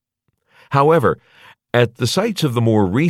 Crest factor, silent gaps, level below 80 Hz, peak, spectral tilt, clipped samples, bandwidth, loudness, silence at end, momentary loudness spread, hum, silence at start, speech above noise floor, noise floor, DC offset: 16 dB; none; -54 dBFS; -2 dBFS; -6 dB/octave; under 0.1%; 15.5 kHz; -17 LUFS; 0 s; 7 LU; none; 0.7 s; 54 dB; -70 dBFS; under 0.1%